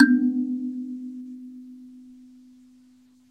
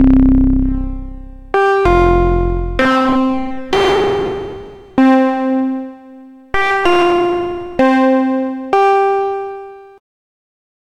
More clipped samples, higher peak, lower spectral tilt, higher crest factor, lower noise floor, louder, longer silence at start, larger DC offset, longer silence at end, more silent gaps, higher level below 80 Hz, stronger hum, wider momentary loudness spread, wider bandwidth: neither; about the same, -2 dBFS vs 0 dBFS; about the same, -6 dB/octave vs -7 dB/octave; first, 24 dB vs 14 dB; first, -56 dBFS vs -38 dBFS; second, -26 LUFS vs -14 LUFS; about the same, 0 s vs 0 s; neither; about the same, 1.2 s vs 1.1 s; neither; second, -80 dBFS vs -24 dBFS; neither; first, 25 LU vs 14 LU; second, 4.9 kHz vs 9.6 kHz